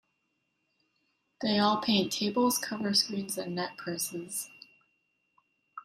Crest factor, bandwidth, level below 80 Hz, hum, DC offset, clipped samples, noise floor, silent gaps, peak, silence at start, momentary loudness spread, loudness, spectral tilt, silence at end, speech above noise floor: 20 dB; 16 kHz; -72 dBFS; none; under 0.1%; under 0.1%; -78 dBFS; none; -12 dBFS; 1.4 s; 10 LU; -29 LUFS; -3.5 dB/octave; 0.05 s; 49 dB